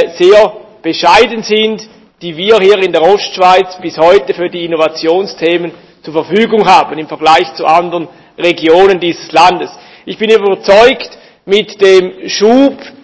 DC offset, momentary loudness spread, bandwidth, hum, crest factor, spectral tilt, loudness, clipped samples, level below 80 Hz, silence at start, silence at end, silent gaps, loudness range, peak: under 0.1%; 12 LU; 8 kHz; none; 10 dB; -4.5 dB/octave; -9 LUFS; 5%; -46 dBFS; 0 s; 0.15 s; none; 2 LU; 0 dBFS